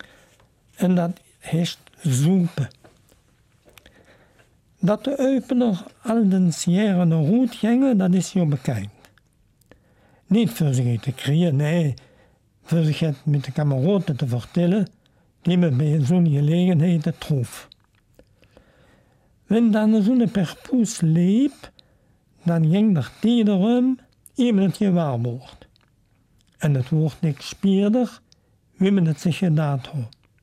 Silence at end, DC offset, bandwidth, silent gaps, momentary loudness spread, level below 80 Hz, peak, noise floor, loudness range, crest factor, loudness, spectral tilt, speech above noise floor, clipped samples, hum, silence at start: 0.35 s; under 0.1%; 14 kHz; none; 10 LU; -60 dBFS; -10 dBFS; -61 dBFS; 5 LU; 12 dB; -21 LUFS; -7.5 dB/octave; 41 dB; under 0.1%; none; 0.8 s